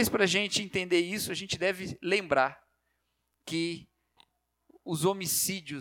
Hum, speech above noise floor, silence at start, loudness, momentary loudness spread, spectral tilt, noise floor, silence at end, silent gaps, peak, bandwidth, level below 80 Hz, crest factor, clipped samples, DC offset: 60 Hz at -65 dBFS; 49 dB; 0 s; -29 LUFS; 10 LU; -3 dB/octave; -79 dBFS; 0 s; none; -10 dBFS; 19 kHz; -64 dBFS; 22 dB; under 0.1%; under 0.1%